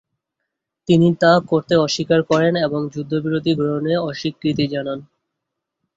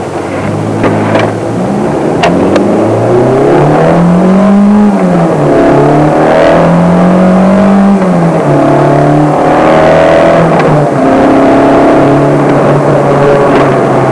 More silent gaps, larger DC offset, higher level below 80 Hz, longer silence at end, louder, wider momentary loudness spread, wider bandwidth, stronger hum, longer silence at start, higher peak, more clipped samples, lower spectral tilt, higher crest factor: neither; neither; second, -56 dBFS vs -32 dBFS; first, 0.95 s vs 0 s; second, -18 LUFS vs -6 LUFS; first, 10 LU vs 5 LU; second, 7.8 kHz vs 11 kHz; neither; first, 0.9 s vs 0 s; about the same, -2 dBFS vs 0 dBFS; neither; second, -6 dB/octave vs -7.5 dB/octave; first, 18 dB vs 6 dB